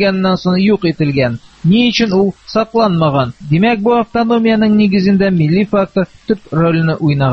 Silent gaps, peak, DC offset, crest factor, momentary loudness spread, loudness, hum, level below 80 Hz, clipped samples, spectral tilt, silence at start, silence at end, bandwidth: none; 0 dBFS; under 0.1%; 12 dB; 6 LU; -13 LUFS; none; -42 dBFS; under 0.1%; -7.5 dB/octave; 0 s; 0 s; 6.6 kHz